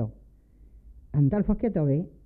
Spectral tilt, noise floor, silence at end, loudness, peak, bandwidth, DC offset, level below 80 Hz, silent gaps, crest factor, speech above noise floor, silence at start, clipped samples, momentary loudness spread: -14 dB/octave; -54 dBFS; 0.15 s; -26 LUFS; -12 dBFS; 2.7 kHz; under 0.1%; -42 dBFS; none; 16 dB; 29 dB; 0 s; under 0.1%; 7 LU